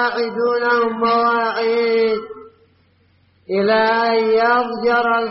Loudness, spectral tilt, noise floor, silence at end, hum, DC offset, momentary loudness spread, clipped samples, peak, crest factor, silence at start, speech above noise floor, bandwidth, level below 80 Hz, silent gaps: -17 LUFS; -2 dB/octave; -57 dBFS; 0 s; none; under 0.1%; 5 LU; under 0.1%; -4 dBFS; 12 dB; 0 s; 40 dB; 5.8 kHz; -62 dBFS; none